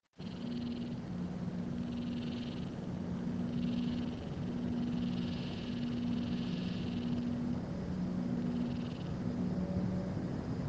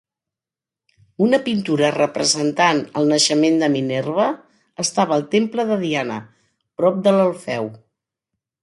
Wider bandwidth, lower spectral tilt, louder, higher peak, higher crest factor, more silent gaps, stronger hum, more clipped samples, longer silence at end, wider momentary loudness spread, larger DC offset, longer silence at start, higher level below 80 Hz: second, 7.8 kHz vs 11.5 kHz; first, -8 dB/octave vs -4 dB/octave; second, -38 LUFS vs -18 LUFS; second, -24 dBFS vs -2 dBFS; about the same, 14 dB vs 18 dB; neither; neither; neither; second, 0 s vs 0.85 s; second, 5 LU vs 10 LU; neither; second, 0.2 s vs 1.2 s; first, -56 dBFS vs -66 dBFS